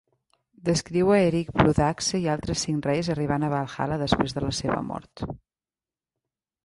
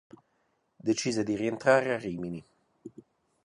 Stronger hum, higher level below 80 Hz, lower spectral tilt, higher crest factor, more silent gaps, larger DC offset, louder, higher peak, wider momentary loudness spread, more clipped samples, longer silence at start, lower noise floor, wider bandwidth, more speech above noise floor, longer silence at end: neither; first, -46 dBFS vs -66 dBFS; about the same, -5.5 dB/octave vs -5 dB/octave; about the same, 22 dB vs 24 dB; neither; neither; first, -25 LUFS vs -29 LUFS; first, -4 dBFS vs -8 dBFS; second, 14 LU vs 25 LU; neither; second, 0.65 s vs 0.85 s; first, under -90 dBFS vs -74 dBFS; about the same, 11.5 kHz vs 11 kHz; first, over 66 dB vs 46 dB; first, 1.3 s vs 0.55 s